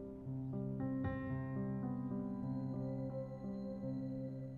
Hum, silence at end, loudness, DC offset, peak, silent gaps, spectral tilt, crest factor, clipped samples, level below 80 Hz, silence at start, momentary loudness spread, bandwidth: none; 0 s; -43 LUFS; under 0.1%; -30 dBFS; none; -11 dB/octave; 12 dB; under 0.1%; -62 dBFS; 0 s; 4 LU; 4.4 kHz